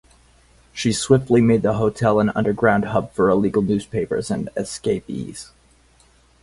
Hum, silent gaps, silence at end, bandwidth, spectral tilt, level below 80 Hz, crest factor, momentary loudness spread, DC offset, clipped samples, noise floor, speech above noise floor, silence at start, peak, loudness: none; none; 1 s; 11.5 kHz; -6 dB/octave; -48 dBFS; 18 dB; 11 LU; under 0.1%; under 0.1%; -55 dBFS; 36 dB; 0.75 s; -2 dBFS; -20 LUFS